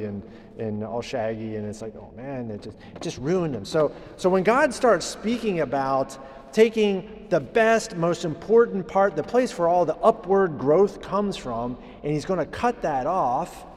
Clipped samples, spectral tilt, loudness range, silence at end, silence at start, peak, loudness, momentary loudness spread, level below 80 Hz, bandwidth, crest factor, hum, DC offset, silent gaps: under 0.1%; -5.5 dB/octave; 7 LU; 0 s; 0 s; -6 dBFS; -24 LUFS; 14 LU; -52 dBFS; 13.5 kHz; 18 dB; none; under 0.1%; none